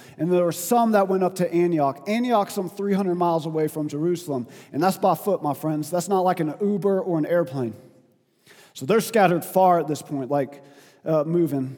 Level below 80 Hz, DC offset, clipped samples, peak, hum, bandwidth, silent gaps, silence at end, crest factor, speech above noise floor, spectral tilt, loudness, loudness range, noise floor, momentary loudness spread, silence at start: -76 dBFS; under 0.1%; under 0.1%; -4 dBFS; none; 19 kHz; none; 0 s; 18 dB; 38 dB; -6 dB/octave; -23 LUFS; 2 LU; -60 dBFS; 9 LU; 0 s